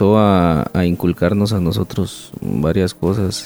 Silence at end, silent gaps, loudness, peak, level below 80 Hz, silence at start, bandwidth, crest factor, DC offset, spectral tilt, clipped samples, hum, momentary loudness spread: 0 s; none; -17 LUFS; -2 dBFS; -38 dBFS; 0 s; over 20 kHz; 14 dB; under 0.1%; -7 dB/octave; under 0.1%; none; 11 LU